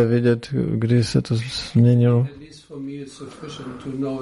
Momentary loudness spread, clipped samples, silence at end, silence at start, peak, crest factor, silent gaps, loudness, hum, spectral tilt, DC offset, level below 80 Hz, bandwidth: 18 LU; under 0.1%; 0 s; 0 s; -6 dBFS; 14 dB; none; -20 LUFS; none; -7.5 dB/octave; under 0.1%; -50 dBFS; 11.5 kHz